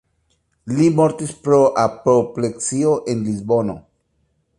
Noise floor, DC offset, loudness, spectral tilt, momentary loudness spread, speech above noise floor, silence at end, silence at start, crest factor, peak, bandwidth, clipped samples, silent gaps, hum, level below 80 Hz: -66 dBFS; under 0.1%; -18 LUFS; -6.5 dB/octave; 11 LU; 49 dB; 0.8 s; 0.65 s; 16 dB; -2 dBFS; 11.5 kHz; under 0.1%; none; none; -54 dBFS